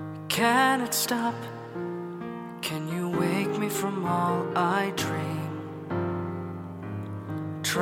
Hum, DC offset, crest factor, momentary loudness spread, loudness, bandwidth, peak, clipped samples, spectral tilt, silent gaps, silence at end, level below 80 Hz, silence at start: none; under 0.1%; 22 dB; 13 LU; -28 LUFS; 16.5 kHz; -8 dBFS; under 0.1%; -4.5 dB/octave; none; 0 s; -66 dBFS; 0 s